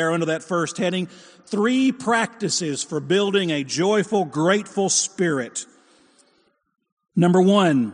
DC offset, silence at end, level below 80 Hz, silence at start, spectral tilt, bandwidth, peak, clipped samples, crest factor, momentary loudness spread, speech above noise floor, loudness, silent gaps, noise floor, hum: under 0.1%; 0 s; -70 dBFS; 0 s; -4.5 dB/octave; 10 kHz; -4 dBFS; under 0.1%; 18 dB; 11 LU; 43 dB; -21 LUFS; 6.92-6.97 s; -64 dBFS; none